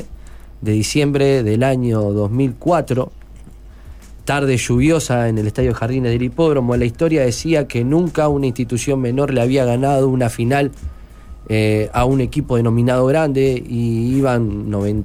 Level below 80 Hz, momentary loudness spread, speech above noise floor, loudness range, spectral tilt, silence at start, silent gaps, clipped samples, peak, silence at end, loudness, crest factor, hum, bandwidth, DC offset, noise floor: -34 dBFS; 6 LU; 21 dB; 2 LU; -6.5 dB/octave; 0 s; none; under 0.1%; -4 dBFS; 0 s; -17 LUFS; 12 dB; none; 15.5 kHz; under 0.1%; -37 dBFS